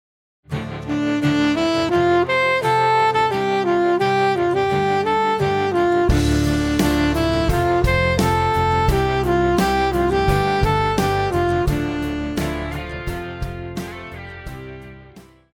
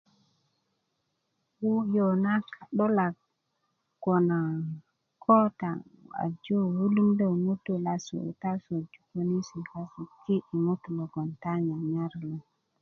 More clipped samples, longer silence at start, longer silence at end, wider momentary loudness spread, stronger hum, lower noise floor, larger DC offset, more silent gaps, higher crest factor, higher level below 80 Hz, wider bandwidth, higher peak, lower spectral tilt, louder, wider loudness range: neither; second, 0.5 s vs 1.6 s; about the same, 0.35 s vs 0.4 s; second, 12 LU vs 15 LU; neither; second, -45 dBFS vs -79 dBFS; neither; neither; second, 14 dB vs 20 dB; first, -30 dBFS vs -72 dBFS; first, 18 kHz vs 7 kHz; first, -4 dBFS vs -8 dBFS; second, -6 dB/octave vs -8.5 dB/octave; first, -19 LUFS vs -29 LUFS; about the same, 7 LU vs 5 LU